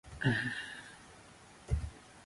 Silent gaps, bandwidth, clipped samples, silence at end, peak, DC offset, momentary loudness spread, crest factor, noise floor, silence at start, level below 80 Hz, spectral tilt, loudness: none; 11.5 kHz; under 0.1%; 0 s; -18 dBFS; under 0.1%; 23 LU; 22 dB; -57 dBFS; 0.05 s; -46 dBFS; -5.5 dB/octave; -37 LUFS